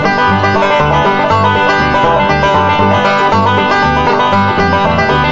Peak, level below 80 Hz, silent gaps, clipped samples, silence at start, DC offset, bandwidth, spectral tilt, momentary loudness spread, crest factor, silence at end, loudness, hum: 0 dBFS; -30 dBFS; none; under 0.1%; 0 s; under 0.1%; 7.8 kHz; -6 dB/octave; 1 LU; 10 dB; 0 s; -10 LUFS; none